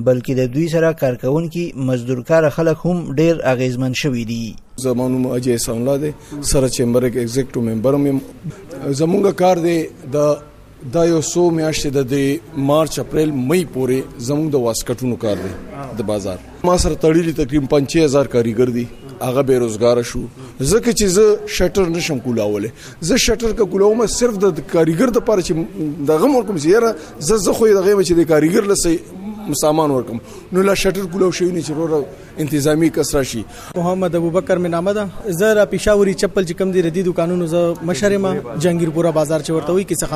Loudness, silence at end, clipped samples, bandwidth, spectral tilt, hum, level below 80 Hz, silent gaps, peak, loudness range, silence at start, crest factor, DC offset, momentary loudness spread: -17 LUFS; 0 s; under 0.1%; 15.5 kHz; -5.5 dB/octave; none; -36 dBFS; none; -2 dBFS; 3 LU; 0 s; 14 dB; under 0.1%; 9 LU